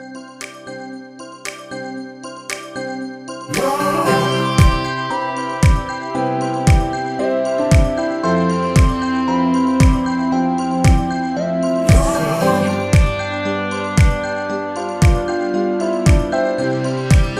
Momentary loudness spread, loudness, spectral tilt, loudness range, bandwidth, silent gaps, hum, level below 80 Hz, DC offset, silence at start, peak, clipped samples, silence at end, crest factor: 15 LU; -17 LUFS; -6 dB/octave; 5 LU; 15.5 kHz; none; none; -22 dBFS; under 0.1%; 0 s; 0 dBFS; under 0.1%; 0 s; 16 dB